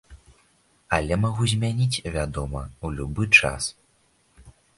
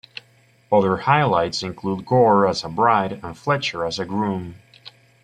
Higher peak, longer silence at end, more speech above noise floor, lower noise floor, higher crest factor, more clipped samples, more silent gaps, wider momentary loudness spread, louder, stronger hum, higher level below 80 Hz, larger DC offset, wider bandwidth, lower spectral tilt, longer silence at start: about the same, -2 dBFS vs -2 dBFS; about the same, 0.3 s vs 0.35 s; first, 40 dB vs 36 dB; first, -64 dBFS vs -56 dBFS; first, 24 dB vs 18 dB; neither; neither; about the same, 15 LU vs 13 LU; second, -23 LUFS vs -20 LUFS; neither; first, -40 dBFS vs -56 dBFS; neither; about the same, 11.5 kHz vs 10.5 kHz; second, -4.5 dB/octave vs -6 dB/octave; second, 0.1 s vs 0.7 s